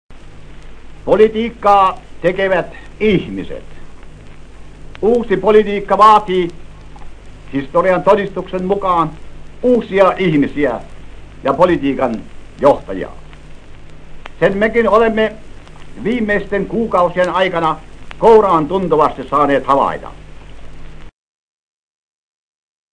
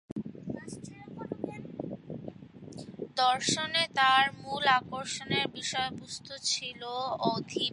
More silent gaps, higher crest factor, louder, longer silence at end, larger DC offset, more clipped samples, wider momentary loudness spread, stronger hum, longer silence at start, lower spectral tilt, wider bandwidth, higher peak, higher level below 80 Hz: second, none vs 0.12-0.16 s; second, 16 dB vs 22 dB; first, -14 LUFS vs -30 LUFS; first, 1.85 s vs 0 s; neither; first, 0.2% vs under 0.1%; second, 13 LU vs 19 LU; neither; about the same, 0.1 s vs 0.1 s; first, -7 dB/octave vs -2.5 dB/octave; second, 10 kHz vs 11.5 kHz; first, 0 dBFS vs -10 dBFS; first, -36 dBFS vs -66 dBFS